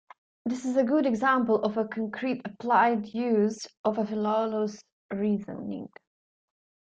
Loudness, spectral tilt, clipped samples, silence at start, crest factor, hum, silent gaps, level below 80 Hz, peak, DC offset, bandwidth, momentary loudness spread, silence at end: -27 LUFS; -6 dB/octave; under 0.1%; 0.45 s; 18 dB; none; 3.77-3.84 s, 4.92-5.09 s; -72 dBFS; -10 dBFS; under 0.1%; 8.6 kHz; 13 LU; 1.05 s